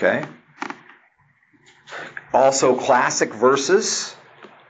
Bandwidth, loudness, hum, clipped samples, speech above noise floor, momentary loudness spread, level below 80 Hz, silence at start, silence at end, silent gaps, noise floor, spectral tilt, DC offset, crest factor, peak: 9.2 kHz; -18 LUFS; none; under 0.1%; 42 dB; 19 LU; -66 dBFS; 0 s; 0.25 s; none; -60 dBFS; -2.5 dB/octave; under 0.1%; 18 dB; -4 dBFS